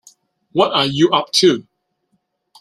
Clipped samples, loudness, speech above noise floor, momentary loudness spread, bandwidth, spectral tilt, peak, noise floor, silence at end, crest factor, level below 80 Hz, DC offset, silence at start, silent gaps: under 0.1%; -15 LUFS; 53 dB; 8 LU; 15 kHz; -4 dB/octave; 0 dBFS; -68 dBFS; 1 s; 18 dB; -60 dBFS; under 0.1%; 0.55 s; none